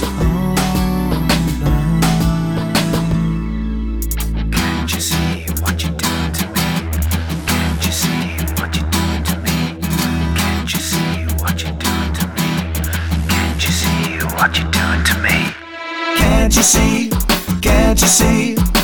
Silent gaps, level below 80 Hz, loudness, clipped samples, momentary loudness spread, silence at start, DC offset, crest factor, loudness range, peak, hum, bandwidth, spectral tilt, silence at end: none; -22 dBFS; -16 LUFS; under 0.1%; 7 LU; 0 s; under 0.1%; 14 dB; 4 LU; -2 dBFS; none; 19.5 kHz; -4 dB/octave; 0 s